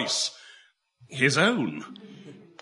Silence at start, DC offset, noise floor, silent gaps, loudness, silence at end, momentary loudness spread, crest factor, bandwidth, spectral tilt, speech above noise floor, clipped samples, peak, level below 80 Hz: 0 s; under 0.1%; -59 dBFS; none; -24 LUFS; 0.25 s; 25 LU; 22 dB; 11.5 kHz; -3.5 dB/octave; 33 dB; under 0.1%; -6 dBFS; -74 dBFS